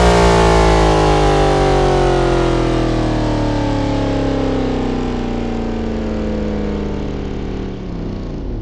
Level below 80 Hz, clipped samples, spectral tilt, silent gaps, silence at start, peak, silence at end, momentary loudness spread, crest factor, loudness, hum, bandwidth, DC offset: -22 dBFS; under 0.1%; -6 dB/octave; none; 0 s; 0 dBFS; 0 s; 13 LU; 14 dB; -16 LUFS; none; 12 kHz; under 0.1%